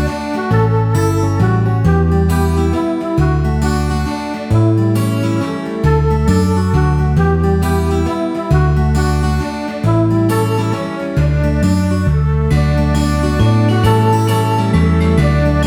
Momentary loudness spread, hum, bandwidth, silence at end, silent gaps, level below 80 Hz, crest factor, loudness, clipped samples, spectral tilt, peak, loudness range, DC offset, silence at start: 5 LU; none; 14.5 kHz; 0 s; none; -22 dBFS; 14 dB; -14 LUFS; under 0.1%; -7.5 dB/octave; 0 dBFS; 2 LU; under 0.1%; 0 s